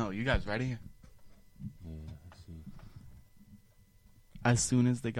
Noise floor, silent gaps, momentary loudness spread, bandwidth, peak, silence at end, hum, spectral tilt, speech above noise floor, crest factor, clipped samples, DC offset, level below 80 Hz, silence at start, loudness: -62 dBFS; none; 25 LU; 14 kHz; -14 dBFS; 0 s; none; -5 dB/octave; 31 dB; 22 dB; under 0.1%; under 0.1%; -48 dBFS; 0 s; -32 LUFS